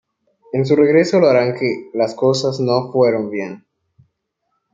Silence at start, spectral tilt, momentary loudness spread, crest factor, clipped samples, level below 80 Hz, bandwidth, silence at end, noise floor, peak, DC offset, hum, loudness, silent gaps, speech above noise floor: 0.55 s; -6.5 dB/octave; 11 LU; 16 dB; under 0.1%; -64 dBFS; 7.8 kHz; 1.15 s; -72 dBFS; -2 dBFS; under 0.1%; none; -16 LUFS; none; 56 dB